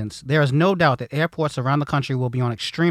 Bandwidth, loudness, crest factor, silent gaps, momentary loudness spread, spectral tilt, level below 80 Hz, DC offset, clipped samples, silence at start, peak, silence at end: 13 kHz; -21 LUFS; 16 dB; none; 6 LU; -6.5 dB/octave; -54 dBFS; under 0.1%; under 0.1%; 0 s; -4 dBFS; 0 s